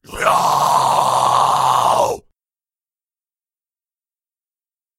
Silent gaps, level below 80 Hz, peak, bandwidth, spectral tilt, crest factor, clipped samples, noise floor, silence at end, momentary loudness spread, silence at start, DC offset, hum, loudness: none; -52 dBFS; -2 dBFS; 16 kHz; -2.5 dB/octave; 16 dB; under 0.1%; under -90 dBFS; 2.8 s; 3 LU; 0.1 s; under 0.1%; none; -15 LUFS